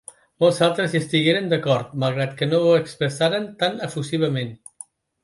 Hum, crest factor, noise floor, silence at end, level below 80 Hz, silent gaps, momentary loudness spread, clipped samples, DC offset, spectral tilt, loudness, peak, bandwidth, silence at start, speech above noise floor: none; 16 dB; -46 dBFS; 0.7 s; -64 dBFS; none; 12 LU; under 0.1%; under 0.1%; -5.5 dB/octave; -21 LUFS; -4 dBFS; 11.5 kHz; 0.4 s; 25 dB